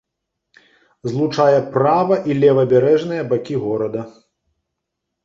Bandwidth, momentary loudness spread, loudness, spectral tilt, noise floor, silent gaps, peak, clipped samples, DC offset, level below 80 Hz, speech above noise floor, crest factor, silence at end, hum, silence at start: 7.4 kHz; 11 LU; -17 LUFS; -8 dB/octave; -78 dBFS; none; -2 dBFS; under 0.1%; under 0.1%; -60 dBFS; 62 dB; 16 dB; 1.15 s; none; 1.05 s